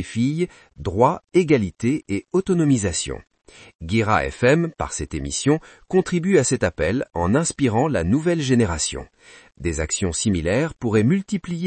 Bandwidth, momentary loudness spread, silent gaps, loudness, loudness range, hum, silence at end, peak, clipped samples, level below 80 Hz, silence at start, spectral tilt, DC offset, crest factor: 8.8 kHz; 9 LU; 3.75-3.79 s; -21 LUFS; 2 LU; none; 0 s; -2 dBFS; under 0.1%; -42 dBFS; 0 s; -5.5 dB/octave; under 0.1%; 18 dB